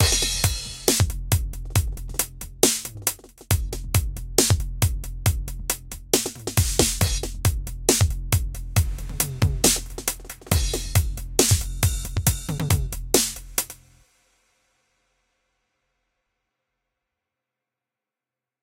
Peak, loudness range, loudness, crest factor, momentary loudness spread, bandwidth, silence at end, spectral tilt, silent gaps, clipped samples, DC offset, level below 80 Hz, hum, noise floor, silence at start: 0 dBFS; 4 LU; -23 LUFS; 24 dB; 8 LU; 17 kHz; 4.9 s; -3.5 dB/octave; none; under 0.1%; under 0.1%; -32 dBFS; none; -89 dBFS; 0 s